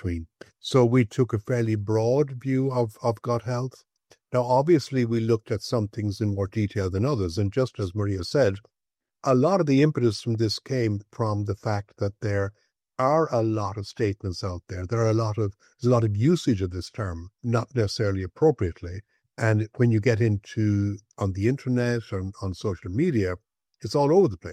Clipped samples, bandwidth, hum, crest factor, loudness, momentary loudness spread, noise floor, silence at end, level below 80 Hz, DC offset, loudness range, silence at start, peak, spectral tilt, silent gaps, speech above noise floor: under 0.1%; 11.5 kHz; none; 18 dB; -25 LUFS; 11 LU; -56 dBFS; 0 s; -58 dBFS; under 0.1%; 3 LU; 0.05 s; -8 dBFS; -7 dB/octave; none; 32 dB